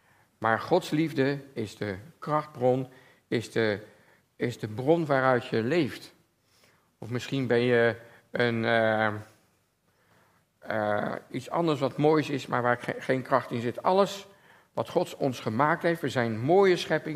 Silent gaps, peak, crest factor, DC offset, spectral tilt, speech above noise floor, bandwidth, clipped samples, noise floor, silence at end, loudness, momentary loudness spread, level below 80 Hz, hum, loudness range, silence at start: none; -8 dBFS; 22 dB; under 0.1%; -6.5 dB/octave; 43 dB; 15.5 kHz; under 0.1%; -70 dBFS; 0 s; -27 LUFS; 12 LU; -72 dBFS; none; 3 LU; 0.4 s